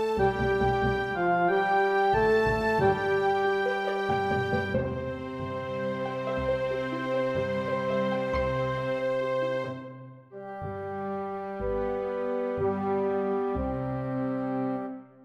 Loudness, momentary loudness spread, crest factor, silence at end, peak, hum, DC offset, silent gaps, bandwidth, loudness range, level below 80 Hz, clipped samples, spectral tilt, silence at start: -28 LUFS; 10 LU; 14 dB; 0 s; -12 dBFS; none; under 0.1%; none; 12 kHz; 7 LU; -46 dBFS; under 0.1%; -7 dB/octave; 0 s